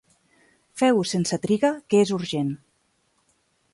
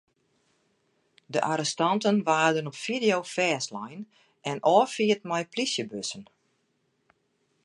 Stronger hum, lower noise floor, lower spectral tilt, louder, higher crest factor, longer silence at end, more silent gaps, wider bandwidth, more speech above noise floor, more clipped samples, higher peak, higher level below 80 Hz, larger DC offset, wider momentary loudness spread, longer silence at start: neither; second, -68 dBFS vs -73 dBFS; first, -5.5 dB/octave vs -4 dB/octave; first, -23 LUFS vs -26 LUFS; second, 16 dB vs 22 dB; second, 1.15 s vs 1.4 s; neither; about the same, 11.5 kHz vs 11.5 kHz; about the same, 46 dB vs 47 dB; neither; about the same, -8 dBFS vs -8 dBFS; first, -64 dBFS vs -78 dBFS; neither; second, 9 LU vs 15 LU; second, 0.75 s vs 1.3 s